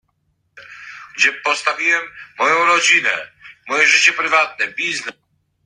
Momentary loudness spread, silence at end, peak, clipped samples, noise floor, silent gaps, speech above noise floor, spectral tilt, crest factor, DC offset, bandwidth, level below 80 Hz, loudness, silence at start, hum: 21 LU; 0.55 s; 0 dBFS; under 0.1%; -67 dBFS; none; 50 dB; 0 dB/octave; 18 dB; under 0.1%; 11 kHz; -68 dBFS; -15 LUFS; 0.55 s; none